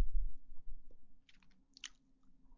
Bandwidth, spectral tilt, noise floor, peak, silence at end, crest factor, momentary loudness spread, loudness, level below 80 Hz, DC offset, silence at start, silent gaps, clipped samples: 7.4 kHz; -2.5 dB/octave; -64 dBFS; -22 dBFS; 0.05 s; 16 dB; 21 LU; -50 LUFS; -46 dBFS; under 0.1%; 0 s; none; under 0.1%